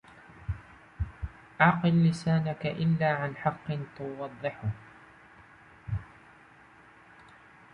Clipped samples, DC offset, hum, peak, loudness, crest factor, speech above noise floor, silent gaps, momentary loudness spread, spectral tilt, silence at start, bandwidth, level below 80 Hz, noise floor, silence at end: under 0.1%; under 0.1%; none; -8 dBFS; -30 LUFS; 24 dB; 28 dB; none; 17 LU; -7.5 dB/octave; 0.15 s; 9.6 kHz; -48 dBFS; -56 dBFS; 1.7 s